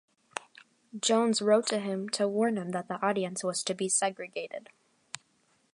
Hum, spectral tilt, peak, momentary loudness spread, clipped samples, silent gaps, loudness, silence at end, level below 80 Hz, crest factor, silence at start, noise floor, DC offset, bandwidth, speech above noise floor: none; -3.5 dB/octave; -12 dBFS; 19 LU; under 0.1%; none; -29 LUFS; 0.55 s; -82 dBFS; 20 dB; 0.35 s; -70 dBFS; under 0.1%; 11.5 kHz; 41 dB